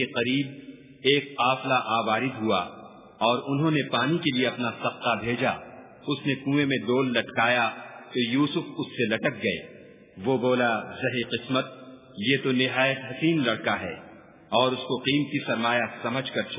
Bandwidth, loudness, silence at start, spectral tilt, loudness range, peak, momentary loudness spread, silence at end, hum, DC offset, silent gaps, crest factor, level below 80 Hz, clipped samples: 3.9 kHz; -26 LUFS; 0 s; -9.5 dB/octave; 2 LU; -6 dBFS; 10 LU; 0 s; none; under 0.1%; none; 20 dB; -64 dBFS; under 0.1%